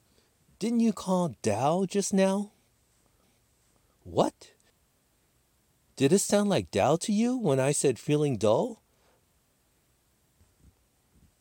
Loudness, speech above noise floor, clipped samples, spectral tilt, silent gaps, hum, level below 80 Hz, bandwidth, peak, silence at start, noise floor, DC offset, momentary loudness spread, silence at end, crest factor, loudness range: -27 LUFS; 43 dB; under 0.1%; -5.5 dB/octave; none; none; -66 dBFS; 17 kHz; -10 dBFS; 0.6 s; -69 dBFS; under 0.1%; 7 LU; 2.65 s; 20 dB; 9 LU